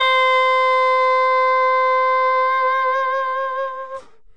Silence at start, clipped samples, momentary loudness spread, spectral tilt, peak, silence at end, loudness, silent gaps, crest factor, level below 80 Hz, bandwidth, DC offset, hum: 0 s; under 0.1%; 11 LU; 0.5 dB/octave; -6 dBFS; 0.35 s; -17 LUFS; none; 10 dB; -68 dBFS; 8.2 kHz; 0.6%; none